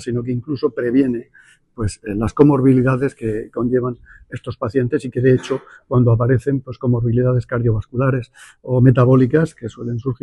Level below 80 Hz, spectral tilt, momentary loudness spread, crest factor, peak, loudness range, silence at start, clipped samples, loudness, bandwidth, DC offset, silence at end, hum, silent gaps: -40 dBFS; -9 dB/octave; 13 LU; 16 dB; 0 dBFS; 2 LU; 0 s; under 0.1%; -18 LUFS; 10.5 kHz; under 0.1%; 0.1 s; none; none